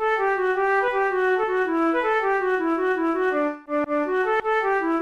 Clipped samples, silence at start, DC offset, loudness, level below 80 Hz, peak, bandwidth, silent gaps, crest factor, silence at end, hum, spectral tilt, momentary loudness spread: under 0.1%; 0 s; 0.1%; -22 LUFS; -56 dBFS; -12 dBFS; 7.6 kHz; none; 10 dB; 0 s; none; -5 dB/octave; 3 LU